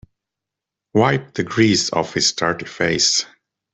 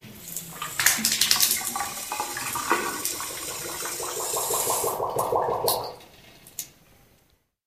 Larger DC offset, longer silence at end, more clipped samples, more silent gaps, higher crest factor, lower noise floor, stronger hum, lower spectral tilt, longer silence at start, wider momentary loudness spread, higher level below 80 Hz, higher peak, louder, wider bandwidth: neither; second, 0.5 s vs 0.95 s; neither; neither; second, 18 dB vs 28 dB; first, -85 dBFS vs -65 dBFS; neither; first, -3.5 dB/octave vs -0.5 dB/octave; first, 0.95 s vs 0.05 s; second, 7 LU vs 17 LU; first, -54 dBFS vs -60 dBFS; about the same, -2 dBFS vs -2 dBFS; first, -18 LUFS vs -25 LUFS; second, 8.4 kHz vs 16 kHz